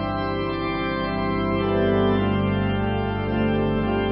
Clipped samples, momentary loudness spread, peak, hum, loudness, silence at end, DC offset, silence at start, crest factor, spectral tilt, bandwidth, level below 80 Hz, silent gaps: under 0.1%; 5 LU; -8 dBFS; 50 Hz at -40 dBFS; -23 LUFS; 0 s; under 0.1%; 0 s; 14 dB; -12 dB/octave; 5.6 kHz; -36 dBFS; none